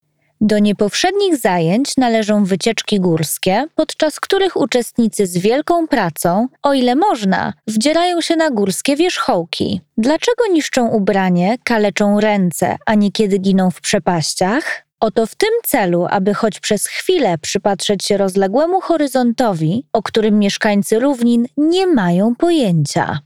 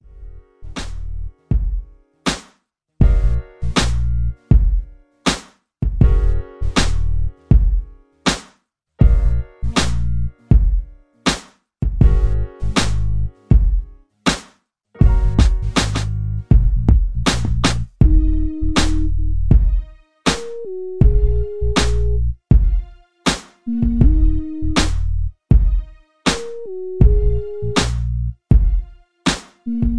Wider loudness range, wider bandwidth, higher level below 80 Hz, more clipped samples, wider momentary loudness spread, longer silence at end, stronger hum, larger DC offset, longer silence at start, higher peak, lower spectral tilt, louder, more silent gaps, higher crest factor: about the same, 1 LU vs 2 LU; first, 16.5 kHz vs 11 kHz; second, -50 dBFS vs -18 dBFS; neither; second, 4 LU vs 10 LU; about the same, 0.05 s vs 0 s; neither; first, 0.5% vs under 0.1%; first, 0.4 s vs 0 s; about the same, 0 dBFS vs 0 dBFS; about the same, -5 dB/octave vs -5.5 dB/octave; first, -15 LUFS vs -19 LUFS; neither; about the same, 14 dB vs 16 dB